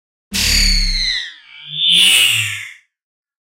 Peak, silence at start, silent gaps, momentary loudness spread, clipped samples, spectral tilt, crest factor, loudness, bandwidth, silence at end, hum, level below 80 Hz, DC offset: 0 dBFS; 0.3 s; none; 18 LU; under 0.1%; 0 dB/octave; 16 dB; -12 LUFS; 16.5 kHz; 0.8 s; none; -26 dBFS; under 0.1%